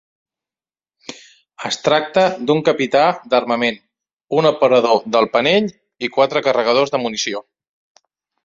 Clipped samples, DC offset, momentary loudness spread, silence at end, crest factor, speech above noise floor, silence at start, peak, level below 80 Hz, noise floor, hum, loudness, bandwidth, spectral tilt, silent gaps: under 0.1%; under 0.1%; 14 LU; 1.05 s; 18 dB; over 74 dB; 1.1 s; 0 dBFS; -62 dBFS; under -90 dBFS; none; -16 LUFS; 7.8 kHz; -4 dB/octave; 4.13-4.17 s